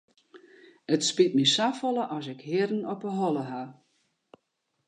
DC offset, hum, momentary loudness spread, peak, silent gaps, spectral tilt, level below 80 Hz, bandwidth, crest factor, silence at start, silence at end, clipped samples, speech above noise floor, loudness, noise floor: under 0.1%; none; 15 LU; -8 dBFS; none; -4 dB/octave; -82 dBFS; 10 kHz; 22 dB; 0.35 s; 1.15 s; under 0.1%; 51 dB; -27 LUFS; -78 dBFS